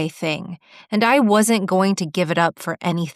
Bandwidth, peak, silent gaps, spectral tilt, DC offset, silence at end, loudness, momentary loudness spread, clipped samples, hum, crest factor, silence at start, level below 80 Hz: 14.5 kHz; -2 dBFS; none; -5 dB/octave; under 0.1%; 0.05 s; -19 LUFS; 11 LU; under 0.1%; none; 18 dB; 0 s; -68 dBFS